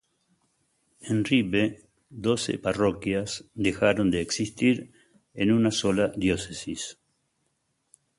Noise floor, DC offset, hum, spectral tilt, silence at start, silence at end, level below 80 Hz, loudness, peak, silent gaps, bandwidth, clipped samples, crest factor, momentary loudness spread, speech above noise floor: -75 dBFS; under 0.1%; none; -5 dB/octave; 1.05 s; 1.25 s; -52 dBFS; -26 LUFS; -8 dBFS; none; 11.5 kHz; under 0.1%; 20 dB; 12 LU; 49 dB